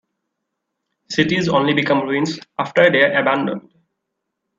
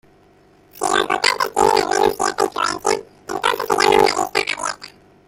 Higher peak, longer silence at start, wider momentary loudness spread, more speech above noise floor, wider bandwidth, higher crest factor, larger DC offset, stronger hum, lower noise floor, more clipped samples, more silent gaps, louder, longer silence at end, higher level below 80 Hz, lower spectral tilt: about the same, 0 dBFS vs 0 dBFS; first, 1.1 s vs 0.75 s; about the same, 11 LU vs 10 LU; first, 61 dB vs 31 dB; second, 7.6 kHz vs 17 kHz; about the same, 20 dB vs 20 dB; neither; neither; first, -78 dBFS vs -52 dBFS; neither; neither; about the same, -17 LUFS vs -18 LUFS; first, 1 s vs 0.4 s; second, -60 dBFS vs -50 dBFS; first, -5.5 dB/octave vs -2 dB/octave